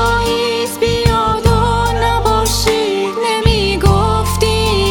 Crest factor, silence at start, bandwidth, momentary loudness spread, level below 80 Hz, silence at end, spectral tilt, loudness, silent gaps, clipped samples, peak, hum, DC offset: 14 dB; 0 s; 19.5 kHz; 3 LU; -22 dBFS; 0 s; -4.5 dB/octave; -14 LUFS; none; under 0.1%; 0 dBFS; none; under 0.1%